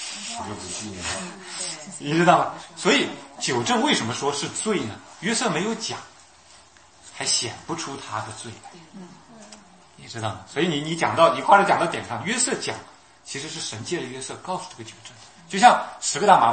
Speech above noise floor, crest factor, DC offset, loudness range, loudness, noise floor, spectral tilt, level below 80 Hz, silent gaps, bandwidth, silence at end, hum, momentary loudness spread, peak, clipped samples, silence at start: 28 dB; 24 dB; under 0.1%; 8 LU; -23 LUFS; -52 dBFS; -3 dB/octave; -62 dBFS; none; 8.8 kHz; 0 s; none; 20 LU; 0 dBFS; under 0.1%; 0 s